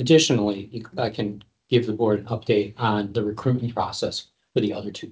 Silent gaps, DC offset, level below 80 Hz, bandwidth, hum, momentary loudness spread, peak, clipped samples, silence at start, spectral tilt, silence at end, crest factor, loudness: none; under 0.1%; -54 dBFS; 8 kHz; none; 11 LU; -4 dBFS; under 0.1%; 0 s; -5.5 dB/octave; 0 s; 20 dB; -24 LUFS